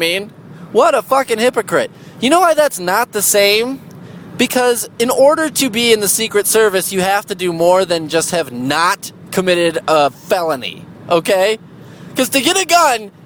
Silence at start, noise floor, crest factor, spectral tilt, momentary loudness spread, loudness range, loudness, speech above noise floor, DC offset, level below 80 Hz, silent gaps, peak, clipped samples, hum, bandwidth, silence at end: 0 s; -35 dBFS; 14 dB; -2.5 dB/octave; 10 LU; 3 LU; -14 LUFS; 21 dB; under 0.1%; -56 dBFS; none; 0 dBFS; under 0.1%; none; 20 kHz; 0.15 s